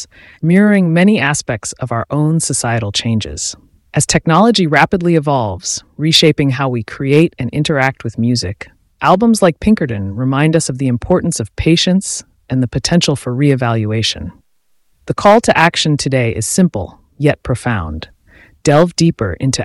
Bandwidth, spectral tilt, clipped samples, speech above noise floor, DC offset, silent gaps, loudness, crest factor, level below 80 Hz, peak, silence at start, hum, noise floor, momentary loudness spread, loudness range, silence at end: 12 kHz; -5 dB/octave; under 0.1%; 45 dB; under 0.1%; none; -14 LUFS; 14 dB; -38 dBFS; 0 dBFS; 0 s; none; -58 dBFS; 11 LU; 3 LU; 0 s